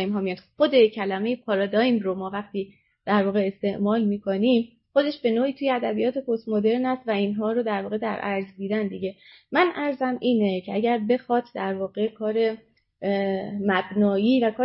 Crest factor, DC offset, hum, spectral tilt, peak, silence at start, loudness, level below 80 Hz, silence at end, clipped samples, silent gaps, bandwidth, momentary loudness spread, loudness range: 18 dB; under 0.1%; none; -10.5 dB/octave; -6 dBFS; 0 s; -24 LUFS; -68 dBFS; 0 s; under 0.1%; none; 5.8 kHz; 8 LU; 2 LU